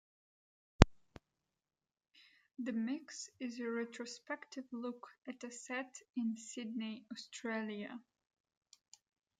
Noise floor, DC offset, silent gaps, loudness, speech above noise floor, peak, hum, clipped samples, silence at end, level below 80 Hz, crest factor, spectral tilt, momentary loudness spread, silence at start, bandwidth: under -90 dBFS; under 0.1%; none; -41 LUFS; over 47 dB; -2 dBFS; none; under 0.1%; 1.4 s; -48 dBFS; 38 dB; -5.5 dB/octave; 18 LU; 0.8 s; 9.4 kHz